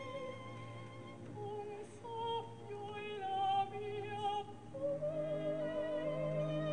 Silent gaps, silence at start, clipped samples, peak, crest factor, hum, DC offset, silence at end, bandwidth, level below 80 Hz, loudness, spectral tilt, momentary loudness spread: none; 0 s; under 0.1%; -26 dBFS; 14 dB; none; 0.1%; 0 s; 10 kHz; -70 dBFS; -41 LUFS; -6.5 dB/octave; 12 LU